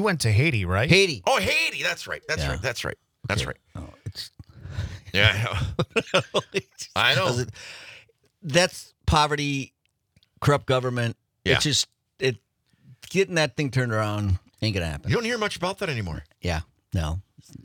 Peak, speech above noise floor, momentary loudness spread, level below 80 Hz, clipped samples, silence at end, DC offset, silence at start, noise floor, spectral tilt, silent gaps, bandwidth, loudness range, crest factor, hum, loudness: -4 dBFS; 42 dB; 16 LU; -44 dBFS; under 0.1%; 0.05 s; under 0.1%; 0 s; -66 dBFS; -4.5 dB/octave; none; 19.5 kHz; 4 LU; 22 dB; none; -24 LUFS